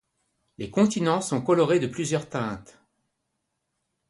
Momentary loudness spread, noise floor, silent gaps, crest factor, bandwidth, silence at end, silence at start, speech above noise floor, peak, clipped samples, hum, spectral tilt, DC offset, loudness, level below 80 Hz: 11 LU; -79 dBFS; none; 18 dB; 11.5 kHz; 1.45 s; 0.6 s; 55 dB; -8 dBFS; under 0.1%; none; -5.5 dB/octave; under 0.1%; -25 LUFS; -62 dBFS